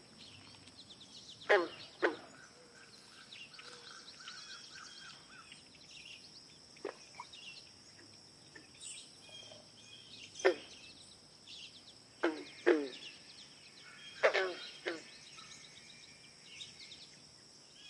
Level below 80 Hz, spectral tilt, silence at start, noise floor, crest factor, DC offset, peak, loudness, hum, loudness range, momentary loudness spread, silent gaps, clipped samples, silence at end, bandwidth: -82 dBFS; -2.5 dB/octave; 0 s; -59 dBFS; 30 dB; under 0.1%; -14 dBFS; -40 LUFS; none; 13 LU; 23 LU; none; under 0.1%; 0 s; 11.5 kHz